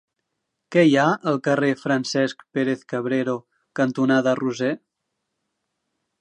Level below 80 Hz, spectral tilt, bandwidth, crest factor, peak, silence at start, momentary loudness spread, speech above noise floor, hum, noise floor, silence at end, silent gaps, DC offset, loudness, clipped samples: -74 dBFS; -6 dB/octave; 9.8 kHz; 18 dB; -4 dBFS; 0.7 s; 9 LU; 58 dB; none; -79 dBFS; 1.45 s; none; under 0.1%; -22 LUFS; under 0.1%